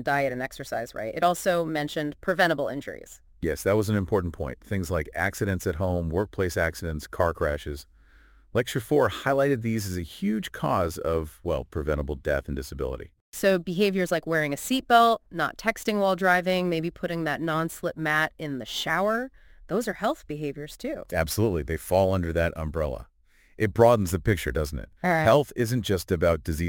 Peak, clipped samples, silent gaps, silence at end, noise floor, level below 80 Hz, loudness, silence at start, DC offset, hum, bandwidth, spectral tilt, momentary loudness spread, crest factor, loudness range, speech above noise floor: -4 dBFS; under 0.1%; 13.21-13.32 s; 0 s; -55 dBFS; -42 dBFS; -26 LUFS; 0 s; under 0.1%; none; 17 kHz; -5.5 dB/octave; 11 LU; 22 dB; 5 LU; 29 dB